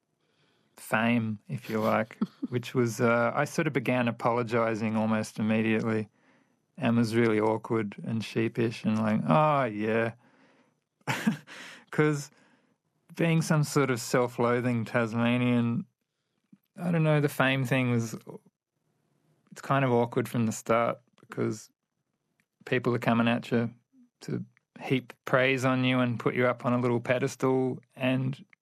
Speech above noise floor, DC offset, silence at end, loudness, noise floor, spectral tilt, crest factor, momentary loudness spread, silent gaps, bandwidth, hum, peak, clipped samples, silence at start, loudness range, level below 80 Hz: 54 dB; under 0.1%; 0.2 s; -28 LUFS; -82 dBFS; -6.5 dB/octave; 20 dB; 12 LU; none; 14 kHz; none; -10 dBFS; under 0.1%; 0.8 s; 4 LU; -76 dBFS